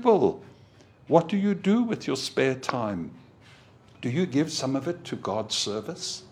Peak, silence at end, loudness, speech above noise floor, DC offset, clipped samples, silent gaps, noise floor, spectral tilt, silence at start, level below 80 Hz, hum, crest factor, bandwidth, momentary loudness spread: -4 dBFS; 0.05 s; -27 LUFS; 28 dB; under 0.1%; under 0.1%; none; -54 dBFS; -5 dB/octave; 0 s; -66 dBFS; none; 22 dB; 14.5 kHz; 10 LU